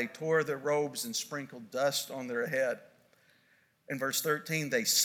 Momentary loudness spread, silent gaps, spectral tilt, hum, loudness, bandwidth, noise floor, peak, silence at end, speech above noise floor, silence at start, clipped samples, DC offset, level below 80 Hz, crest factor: 10 LU; none; -2.5 dB/octave; none; -32 LUFS; 19 kHz; -69 dBFS; -14 dBFS; 0 s; 36 dB; 0 s; under 0.1%; under 0.1%; -86 dBFS; 18 dB